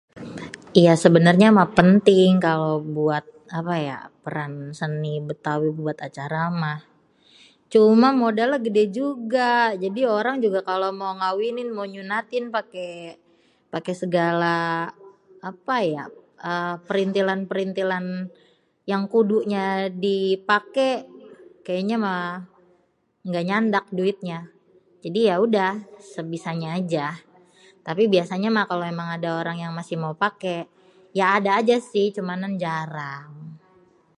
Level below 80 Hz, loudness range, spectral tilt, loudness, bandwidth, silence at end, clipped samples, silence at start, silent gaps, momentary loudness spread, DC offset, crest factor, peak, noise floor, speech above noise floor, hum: -66 dBFS; 7 LU; -6.5 dB/octave; -22 LUFS; 11.5 kHz; 0.6 s; under 0.1%; 0.15 s; none; 19 LU; under 0.1%; 22 dB; 0 dBFS; -65 dBFS; 44 dB; none